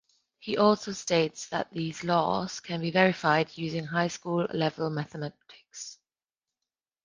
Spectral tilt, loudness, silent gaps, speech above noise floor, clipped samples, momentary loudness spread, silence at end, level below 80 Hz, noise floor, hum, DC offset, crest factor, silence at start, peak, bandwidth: -5 dB/octave; -28 LUFS; none; over 62 dB; under 0.1%; 16 LU; 1.1 s; -66 dBFS; under -90 dBFS; none; under 0.1%; 22 dB; 0.4 s; -6 dBFS; 10 kHz